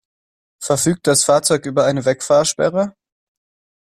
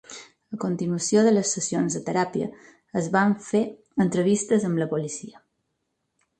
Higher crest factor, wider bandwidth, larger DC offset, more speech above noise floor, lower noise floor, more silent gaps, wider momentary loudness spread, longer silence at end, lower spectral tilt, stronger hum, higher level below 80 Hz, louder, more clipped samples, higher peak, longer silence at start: about the same, 16 dB vs 18 dB; first, 15 kHz vs 10 kHz; neither; first, over 74 dB vs 53 dB; first, under -90 dBFS vs -77 dBFS; neither; second, 8 LU vs 14 LU; about the same, 1.05 s vs 1.1 s; second, -3.5 dB/octave vs -5 dB/octave; neither; first, -56 dBFS vs -66 dBFS; first, -16 LUFS vs -24 LUFS; neither; first, -2 dBFS vs -8 dBFS; first, 0.6 s vs 0.1 s